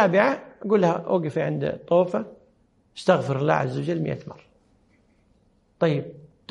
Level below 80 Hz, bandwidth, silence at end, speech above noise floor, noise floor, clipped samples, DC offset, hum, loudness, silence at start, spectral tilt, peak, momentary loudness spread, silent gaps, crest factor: -64 dBFS; 11 kHz; 0.3 s; 40 dB; -62 dBFS; under 0.1%; under 0.1%; none; -24 LUFS; 0 s; -7.5 dB/octave; -4 dBFS; 12 LU; none; 20 dB